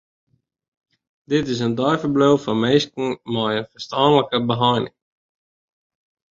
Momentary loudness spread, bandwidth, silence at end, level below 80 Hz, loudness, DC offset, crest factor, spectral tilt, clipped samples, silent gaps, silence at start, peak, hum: 8 LU; 7.6 kHz; 1.5 s; -58 dBFS; -20 LUFS; under 0.1%; 18 dB; -6 dB/octave; under 0.1%; none; 1.3 s; -2 dBFS; none